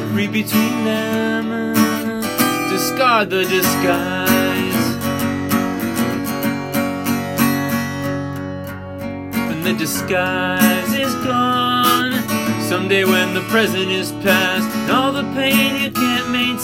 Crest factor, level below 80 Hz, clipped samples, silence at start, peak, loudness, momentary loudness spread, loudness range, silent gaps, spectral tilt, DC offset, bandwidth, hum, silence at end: 18 dB; -52 dBFS; under 0.1%; 0 s; 0 dBFS; -17 LUFS; 7 LU; 5 LU; none; -4 dB/octave; under 0.1%; 17 kHz; none; 0 s